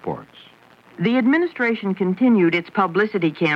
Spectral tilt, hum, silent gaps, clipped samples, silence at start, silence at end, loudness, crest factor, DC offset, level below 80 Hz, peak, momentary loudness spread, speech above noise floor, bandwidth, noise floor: -8 dB/octave; none; none; under 0.1%; 0.05 s; 0 s; -19 LUFS; 16 dB; under 0.1%; -66 dBFS; -4 dBFS; 7 LU; 31 dB; 6.4 kHz; -50 dBFS